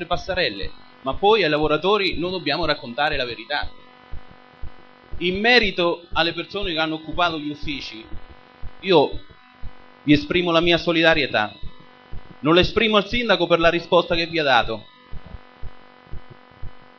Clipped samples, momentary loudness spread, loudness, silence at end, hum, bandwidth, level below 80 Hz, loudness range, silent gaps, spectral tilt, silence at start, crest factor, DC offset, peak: under 0.1%; 14 LU; -20 LUFS; 0.15 s; none; 6.8 kHz; -40 dBFS; 5 LU; none; -5.5 dB/octave; 0 s; 20 dB; 0.1%; -2 dBFS